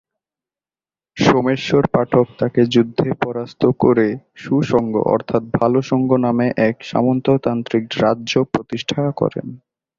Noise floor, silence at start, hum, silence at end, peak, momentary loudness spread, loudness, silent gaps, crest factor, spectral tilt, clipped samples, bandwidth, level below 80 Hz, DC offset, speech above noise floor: under -90 dBFS; 1.15 s; none; 0.45 s; -2 dBFS; 7 LU; -17 LUFS; none; 16 dB; -7 dB/octave; under 0.1%; 7.4 kHz; -50 dBFS; under 0.1%; over 73 dB